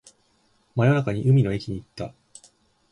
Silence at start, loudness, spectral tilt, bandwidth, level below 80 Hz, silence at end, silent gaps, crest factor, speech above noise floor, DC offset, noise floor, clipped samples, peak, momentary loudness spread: 0.75 s; -23 LUFS; -8 dB/octave; 10.5 kHz; -52 dBFS; 0.8 s; none; 16 dB; 43 dB; under 0.1%; -65 dBFS; under 0.1%; -8 dBFS; 17 LU